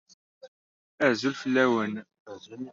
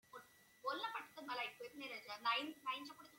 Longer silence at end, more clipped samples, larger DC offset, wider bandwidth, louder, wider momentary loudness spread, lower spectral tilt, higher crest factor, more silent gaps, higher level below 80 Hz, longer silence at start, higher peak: about the same, 0 s vs 0 s; neither; neither; second, 7.6 kHz vs 16.5 kHz; first, -26 LUFS vs -45 LUFS; first, 21 LU vs 11 LU; first, -3.5 dB/octave vs -2 dB/octave; about the same, 20 dB vs 20 dB; first, 0.48-0.98 s, 2.20-2.26 s vs none; first, -74 dBFS vs under -90 dBFS; first, 0.45 s vs 0.1 s; first, -8 dBFS vs -26 dBFS